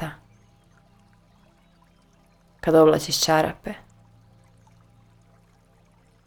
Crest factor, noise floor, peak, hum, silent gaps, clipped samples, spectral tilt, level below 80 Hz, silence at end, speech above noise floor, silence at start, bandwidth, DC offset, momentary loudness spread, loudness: 22 dB; -58 dBFS; -4 dBFS; none; none; under 0.1%; -4 dB/octave; -54 dBFS; 2.5 s; 39 dB; 0 s; 19 kHz; under 0.1%; 20 LU; -20 LUFS